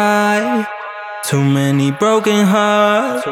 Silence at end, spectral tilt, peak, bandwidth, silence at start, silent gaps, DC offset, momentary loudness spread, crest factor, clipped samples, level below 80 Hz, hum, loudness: 0 s; -5.5 dB/octave; -2 dBFS; 16.5 kHz; 0 s; none; under 0.1%; 11 LU; 14 dB; under 0.1%; -72 dBFS; none; -14 LUFS